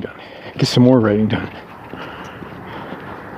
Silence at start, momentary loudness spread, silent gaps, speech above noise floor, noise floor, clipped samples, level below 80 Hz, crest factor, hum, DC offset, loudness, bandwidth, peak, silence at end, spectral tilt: 0 s; 21 LU; none; 21 dB; -35 dBFS; under 0.1%; -48 dBFS; 18 dB; none; under 0.1%; -15 LUFS; 14 kHz; 0 dBFS; 0 s; -6.5 dB/octave